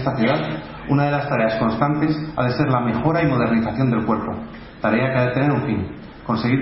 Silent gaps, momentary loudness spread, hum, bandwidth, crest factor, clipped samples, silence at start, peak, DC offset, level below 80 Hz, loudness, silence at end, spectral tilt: none; 9 LU; none; 5.8 kHz; 18 dB; under 0.1%; 0 s; -2 dBFS; under 0.1%; -44 dBFS; -20 LUFS; 0 s; -11.5 dB/octave